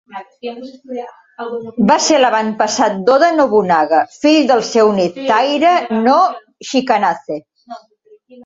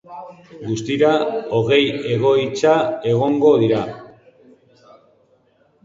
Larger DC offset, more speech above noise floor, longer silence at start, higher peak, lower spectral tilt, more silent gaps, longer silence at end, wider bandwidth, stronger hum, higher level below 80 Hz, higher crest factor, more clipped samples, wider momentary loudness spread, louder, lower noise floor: neither; second, 36 dB vs 41 dB; about the same, 0.1 s vs 0.1 s; about the same, 0 dBFS vs -2 dBFS; second, -4 dB/octave vs -6 dB/octave; neither; second, 0.05 s vs 1.8 s; about the same, 8 kHz vs 7.8 kHz; neither; about the same, -60 dBFS vs -58 dBFS; about the same, 14 dB vs 18 dB; neither; about the same, 17 LU vs 19 LU; first, -13 LUFS vs -17 LUFS; second, -49 dBFS vs -58 dBFS